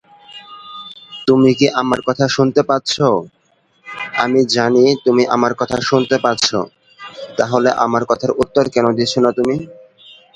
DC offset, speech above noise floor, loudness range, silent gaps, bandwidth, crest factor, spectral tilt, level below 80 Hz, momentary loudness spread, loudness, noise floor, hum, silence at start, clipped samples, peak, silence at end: under 0.1%; 43 dB; 2 LU; none; 10.5 kHz; 16 dB; -5 dB/octave; -52 dBFS; 19 LU; -15 LUFS; -57 dBFS; none; 0.3 s; under 0.1%; 0 dBFS; 0.65 s